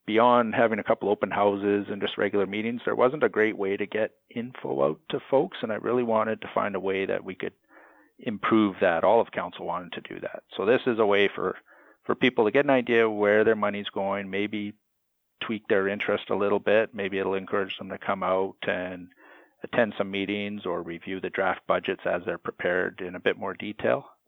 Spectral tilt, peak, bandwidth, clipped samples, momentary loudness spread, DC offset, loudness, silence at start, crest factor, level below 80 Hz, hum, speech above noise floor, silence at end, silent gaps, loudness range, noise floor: -8 dB/octave; -6 dBFS; 6 kHz; under 0.1%; 12 LU; under 0.1%; -26 LUFS; 0.05 s; 20 dB; -70 dBFS; none; 50 dB; 0.2 s; none; 5 LU; -76 dBFS